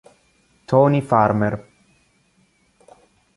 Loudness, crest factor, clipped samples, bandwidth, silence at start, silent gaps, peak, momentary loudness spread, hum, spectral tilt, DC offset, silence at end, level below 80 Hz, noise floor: -18 LUFS; 20 dB; under 0.1%; 11.5 kHz; 0.7 s; none; -2 dBFS; 8 LU; none; -9 dB/octave; under 0.1%; 1.75 s; -54 dBFS; -61 dBFS